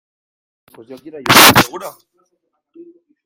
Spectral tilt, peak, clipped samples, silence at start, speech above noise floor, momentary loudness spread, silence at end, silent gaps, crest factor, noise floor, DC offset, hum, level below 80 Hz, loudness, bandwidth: -2 dB/octave; 0 dBFS; 0.4%; 0.9 s; 56 dB; 25 LU; 1.35 s; none; 16 dB; -69 dBFS; under 0.1%; none; -50 dBFS; -8 LUFS; over 20 kHz